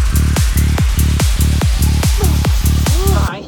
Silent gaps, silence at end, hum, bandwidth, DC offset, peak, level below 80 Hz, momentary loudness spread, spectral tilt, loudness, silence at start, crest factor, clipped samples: none; 0 s; none; 19.5 kHz; under 0.1%; 0 dBFS; -16 dBFS; 1 LU; -5 dB/octave; -14 LUFS; 0 s; 12 dB; under 0.1%